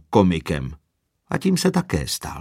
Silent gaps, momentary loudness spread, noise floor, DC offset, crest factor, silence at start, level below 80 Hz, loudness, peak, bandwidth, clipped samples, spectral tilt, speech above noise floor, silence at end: none; 10 LU; -70 dBFS; under 0.1%; 20 dB; 0.1 s; -40 dBFS; -22 LUFS; -2 dBFS; 16 kHz; under 0.1%; -5.5 dB/octave; 49 dB; 0 s